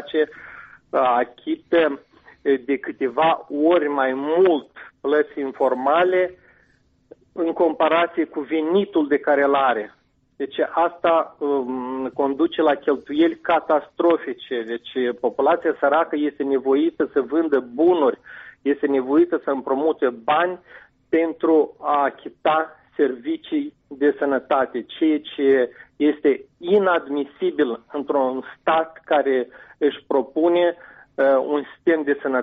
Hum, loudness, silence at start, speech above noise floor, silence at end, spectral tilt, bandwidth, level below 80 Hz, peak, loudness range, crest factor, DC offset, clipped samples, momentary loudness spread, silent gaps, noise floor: none; -21 LUFS; 0 s; 40 dB; 0 s; -3 dB/octave; 4.6 kHz; -66 dBFS; -8 dBFS; 2 LU; 14 dB; under 0.1%; under 0.1%; 9 LU; none; -61 dBFS